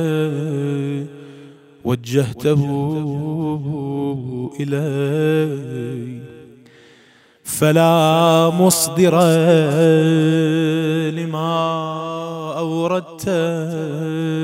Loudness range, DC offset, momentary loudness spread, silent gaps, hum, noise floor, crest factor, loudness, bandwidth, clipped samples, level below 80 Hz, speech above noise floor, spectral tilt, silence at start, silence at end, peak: 8 LU; under 0.1%; 13 LU; none; none; -51 dBFS; 16 dB; -18 LUFS; 16 kHz; under 0.1%; -58 dBFS; 34 dB; -6 dB/octave; 0 s; 0 s; -2 dBFS